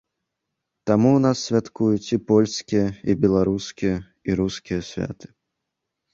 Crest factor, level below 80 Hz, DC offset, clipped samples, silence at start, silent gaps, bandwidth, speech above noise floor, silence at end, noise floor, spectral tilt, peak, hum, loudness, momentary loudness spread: 18 dB; -48 dBFS; under 0.1%; under 0.1%; 0.85 s; none; 7.8 kHz; 60 dB; 1 s; -81 dBFS; -6.5 dB/octave; -4 dBFS; none; -22 LUFS; 11 LU